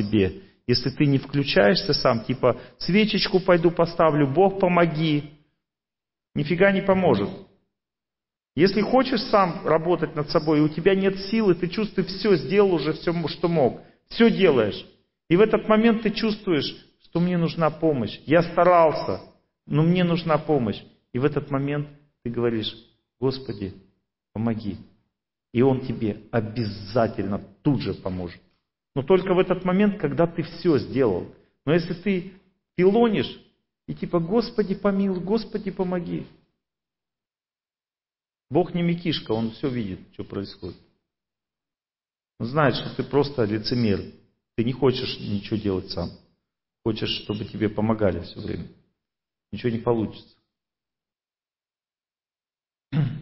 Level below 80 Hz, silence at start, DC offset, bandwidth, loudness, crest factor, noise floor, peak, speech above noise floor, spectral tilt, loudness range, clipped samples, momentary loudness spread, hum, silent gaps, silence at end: -50 dBFS; 0 s; under 0.1%; 5.8 kHz; -23 LUFS; 18 dB; under -90 dBFS; -6 dBFS; over 68 dB; -10.5 dB/octave; 9 LU; under 0.1%; 14 LU; none; none; 0 s